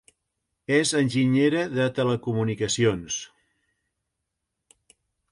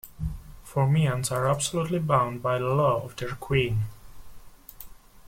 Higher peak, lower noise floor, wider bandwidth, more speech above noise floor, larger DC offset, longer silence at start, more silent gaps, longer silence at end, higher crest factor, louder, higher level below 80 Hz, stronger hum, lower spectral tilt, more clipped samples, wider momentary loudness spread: about the same, -8 dBFS vs -10 dBFS; first, -82 dBFS vs -45 dBFS; second, 11.5 kHz vs 16.5 kHz; first, 59 dB vs 21 dB; neither; first, 0.7 s vs 0.05 s; neither; first, 2.05 s vs 0 s; about the same, 18 dB vs 18 dB; about the same, -24 LUFS vs -26 LUFS; second, -58 dBFS vs -46 dBFS; neither; about the same, -5 dB/octave vs -5.5 dB/octave; neither; second, 11 LU vs 19 LU